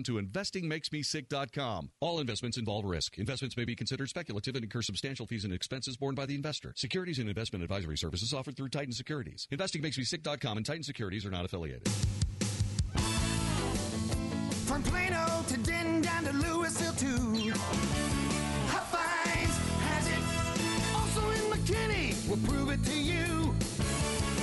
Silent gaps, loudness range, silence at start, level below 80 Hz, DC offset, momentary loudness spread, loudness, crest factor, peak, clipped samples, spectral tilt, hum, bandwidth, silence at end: none; 5 LU; 0 s; -44 dBFS; under 0.1%; 7 LU; -33 LUFS; 14 dB; -20 dBFS; under 0.1%; -4.5 dB/octave; none; 11.5 kHz; 0 s